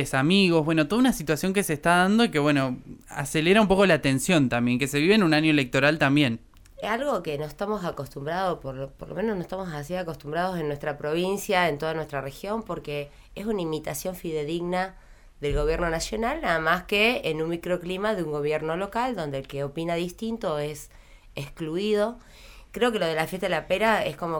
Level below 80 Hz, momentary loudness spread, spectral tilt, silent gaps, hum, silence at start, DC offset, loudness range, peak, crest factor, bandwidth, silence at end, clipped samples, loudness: -46 dBFS; 13 LU; -5 dB/octave; none; none; 0 s; under 0.1%; 9 LU; -6 dBFS; 18 dB; over 20 kHz; 0 s; under 0.1%; -25 LUFS